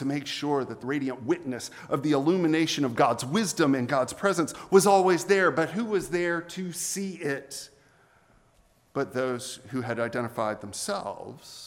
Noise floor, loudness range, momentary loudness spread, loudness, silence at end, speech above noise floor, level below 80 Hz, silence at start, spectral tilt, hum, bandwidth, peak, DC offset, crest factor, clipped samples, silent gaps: -63 dBFS; 10 LU; 12 LU; -27 LUFS; 0 s; 36 dB; -66 dBFS; 0 s; -4.5 dB/octave; none; 17 kHz; -6 dBFS; under 0.1%; 22 dB; under 0.1%; none